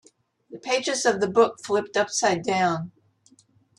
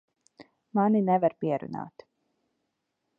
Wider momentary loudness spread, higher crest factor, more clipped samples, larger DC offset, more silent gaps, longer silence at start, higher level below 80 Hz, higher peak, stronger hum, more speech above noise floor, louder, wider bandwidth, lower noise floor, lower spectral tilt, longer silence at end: second, 8 LU vs 16 LU; about the same, 20 dB vs 18 dB; neither; neither; neither; about the same, 0.5 s vs 0.4 s; first, -70 dBFS vs -76 dBFS; first, -4 dBFS vs -12 dBFS; neither; second, 37 dB vs 54 dB; first, -23 LUFS vs -27 LUFS; first, 12 kHz vs 5.4 kHz; second, -60 dBFS vs -80 dBFS; second, -3.5 dB/octave vs -10 dB/octave; second, 0.9 s vs 1.3 s